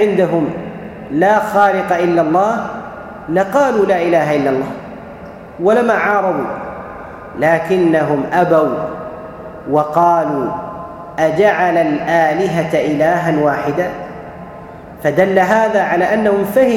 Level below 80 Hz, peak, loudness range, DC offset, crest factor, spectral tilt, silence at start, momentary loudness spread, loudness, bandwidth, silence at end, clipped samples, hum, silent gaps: -48 dBFS; 0 dBFS; 2 LU; under 0.1%; 14 dB; -6.5 dB/octave; 0 s; 17 LU; -14 LUFS; 17 kHz; 0 s; under 0.1%; none; none